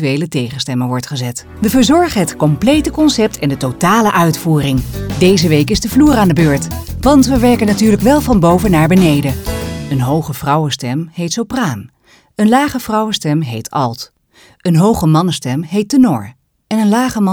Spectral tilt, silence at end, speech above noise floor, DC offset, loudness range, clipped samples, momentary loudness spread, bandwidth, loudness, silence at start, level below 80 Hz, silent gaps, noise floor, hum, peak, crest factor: -5.5 dB/octave; 0 s; 35 dB; under 0.1%; 5 LU; under 0.1%; 10 LU; over 20 kHz; -13 LUFS; 0 s; -32 dBFS; none; -47 dBFS; none; 0 dBFS; 12 dB